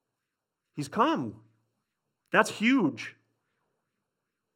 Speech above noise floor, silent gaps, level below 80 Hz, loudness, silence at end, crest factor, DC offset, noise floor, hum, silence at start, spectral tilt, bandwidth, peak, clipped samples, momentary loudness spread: 59 dB; none; -78 dBFS; -27 LUFS; 1.45 s; 26 dB; under 0.1%; -86 dBFS; none; 0.75 s; -5 dB/octave; 16 kHz; -4 dBFS; under 0.1%; 16 LU